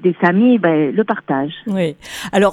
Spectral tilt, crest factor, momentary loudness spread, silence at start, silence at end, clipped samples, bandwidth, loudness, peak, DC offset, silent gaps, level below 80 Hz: -6.5 dB/octave; 14 dB; 9 LU; 0 s; 0 s; under 0.1%; 14.5 kHz; -16 LUFS; -2 dBFS; under 0.1%; none; -52 dBFS